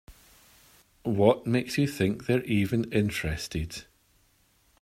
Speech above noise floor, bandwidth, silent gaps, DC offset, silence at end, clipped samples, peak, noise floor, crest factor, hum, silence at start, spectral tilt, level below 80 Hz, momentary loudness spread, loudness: 39 dB; 16 kHz; none; under 0.1%; 1 s; under 0.1%; -6 dBFS; -66 dBFS; 22 dB; none; 0.1 s; -6 dB/octave; -50 dBFS; 11 LU; -27 LUFS